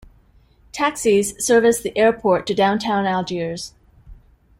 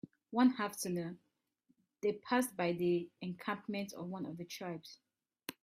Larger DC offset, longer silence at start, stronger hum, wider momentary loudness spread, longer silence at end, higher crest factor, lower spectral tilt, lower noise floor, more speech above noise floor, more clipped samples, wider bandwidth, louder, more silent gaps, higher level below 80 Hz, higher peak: neither; first, 0.75 s vs 0.05 s; neither; second, 12 LU vs 16 LU; first, 0.45 s vs 0.1 s; about the same, 18 dB vs 20 dB; about the same, -4 dB/octave vs -5 dB/octave; second, -54 dBFS vs -78 dBFS; second, 35 dB vs 41 dB; neither; about the same, 16 kHz vs 16 kHz; first, -19 LUFS vs -37 LUFS; neither; first, -50 dBFS vs -80 dBFS; first, -2 dBFS vs -18 dBFS